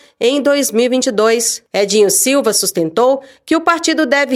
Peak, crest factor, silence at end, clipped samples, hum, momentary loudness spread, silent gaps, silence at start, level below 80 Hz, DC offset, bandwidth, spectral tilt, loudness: 0 dBFS; 14 dB; 0 s; under 0.1%; none; 5 LU; none; 0.2 s; -62 dBFS; under 0.1%; 16.5 kHz; -2 dB/octave; -13 LUFS